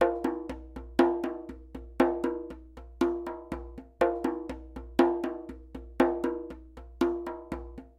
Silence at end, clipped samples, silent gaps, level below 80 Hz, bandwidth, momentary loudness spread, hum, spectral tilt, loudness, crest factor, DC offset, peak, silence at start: 0.1 s; under 0.1%; none; -48 dBFS; 13 kHz; 19 LU; none; -6.5 dB/octave; -31 LUFS; 22 dB; under 0.1%; -8 dBFS; 0 s